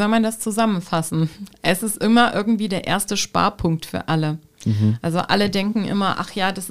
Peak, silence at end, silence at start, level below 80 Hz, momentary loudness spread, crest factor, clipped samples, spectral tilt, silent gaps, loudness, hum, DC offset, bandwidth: -2 dBFS; 0 s; 0 s; -48 dBFS; 6 LU; 18 dB; under 0.1%; -5 dB/octave; none; -20 LUFS; none; 0.8%; 16 kHz